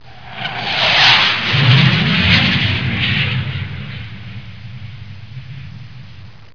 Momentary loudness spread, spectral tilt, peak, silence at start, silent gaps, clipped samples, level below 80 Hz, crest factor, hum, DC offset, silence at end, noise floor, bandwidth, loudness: 24 LU; -5 dB/octave; 0 dBFS; 0.05 s; none; under 0.1%; -40 dBFS; 16 dB; none; 1%; 0.25 s; -38 dBFS; 5.4 kHz; -12 LUFS